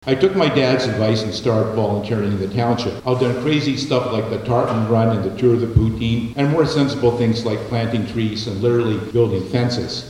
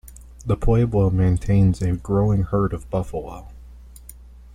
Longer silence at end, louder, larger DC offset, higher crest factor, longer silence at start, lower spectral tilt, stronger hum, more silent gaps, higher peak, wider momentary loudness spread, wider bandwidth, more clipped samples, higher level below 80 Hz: second, 0 s vs 0.25 s; about the same, -19 LUFS vs -21 LUFS; neither; about the same, 16 dB vs 14 dB; about the same, 0.05 s vs 0.05 s; second, -7 dB/octave vs -9 dB/octave; neither; neither; first, 0 dBFS vs -6 dBFS; second, 5 LU vs 13 LU; second, 11.5 kHz vs 15 kHz; neither; second, -40 dBFS vs -32 dBFS